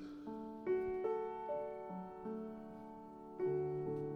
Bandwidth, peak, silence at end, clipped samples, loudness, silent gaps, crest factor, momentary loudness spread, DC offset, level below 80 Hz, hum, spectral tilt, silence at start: 5.6 kHz; -28 dBFS; 0 s; under 0.1%; -43 LUFS; none; 14 dB; 14 LU; under 0.1%; -70 dBFS; none; -9.5 dB/octave; 0 s